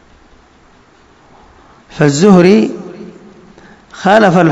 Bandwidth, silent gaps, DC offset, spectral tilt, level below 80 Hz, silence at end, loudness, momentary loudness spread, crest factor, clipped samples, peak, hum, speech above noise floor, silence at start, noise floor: 8.4 kHz; none; under 0.1%; -6.5 dB/octave; -48 dBFS; 0 s; -9 LUFS; 22 LU; 12 dB; 1%; 0 dBFS; none; 38 dB; 1.95 s; -45 dBFS